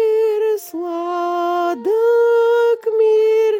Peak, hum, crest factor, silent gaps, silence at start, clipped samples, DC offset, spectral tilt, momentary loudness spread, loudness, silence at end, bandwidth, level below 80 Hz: -6 dBFS; none; 8 dB; none; 0 s; under 0.1%; under 0.1%; -3 dB/octave; 8 LU; -17 LUFS; 0 s; 17 kHz; -82 dBFS